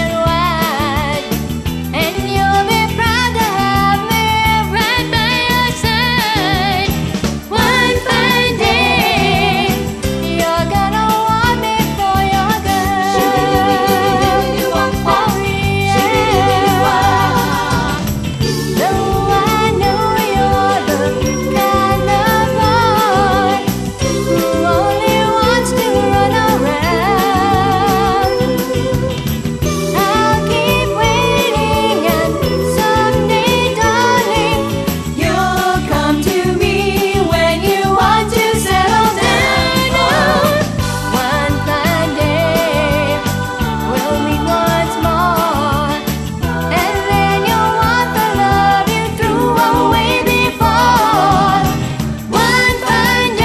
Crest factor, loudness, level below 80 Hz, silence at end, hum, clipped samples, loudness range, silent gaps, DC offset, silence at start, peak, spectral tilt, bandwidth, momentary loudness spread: 12 dB; -13 LUFS; -28 dBFS; 0 s; none; under 0.1%; 2 LU; none; under 0.1%; 0 s; 0 dBFS; -4.5 dB/octave; 14 kHz; 5 LU